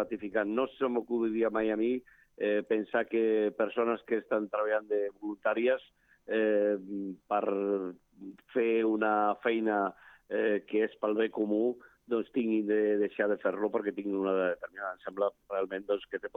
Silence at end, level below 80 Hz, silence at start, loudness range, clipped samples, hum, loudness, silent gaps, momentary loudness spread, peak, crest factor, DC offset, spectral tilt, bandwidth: 0.1 s; -72 dBFS; 0 s; 1 LU; under 0.1%; none; -31 LUFS; none; 8 LU; -14 dBFS; 16 dB; under 0.1%; -8 dB/octave; 3.9 kHz